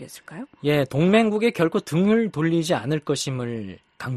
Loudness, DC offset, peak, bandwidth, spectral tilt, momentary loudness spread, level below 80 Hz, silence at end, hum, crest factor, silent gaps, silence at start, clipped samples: -22 LUFS; under 0.1%; -6 dBFS; 13 kHz; -6 dB/octave; 18 LU; -58 dBFS; 0 s; none; 16 dB; none; 0 s; under 0.1%